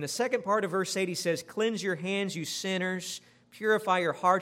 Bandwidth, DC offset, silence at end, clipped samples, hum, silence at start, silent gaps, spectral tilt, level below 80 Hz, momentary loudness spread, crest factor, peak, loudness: 16 kHz; under 0.1%; 0 s; under 0.1%; 60 Hz at -65 dBFS; 0 s; none; -4 dB/octave; -80 dBFS; 7 LU; 20 dB; -10 dBFS; -30 LUFS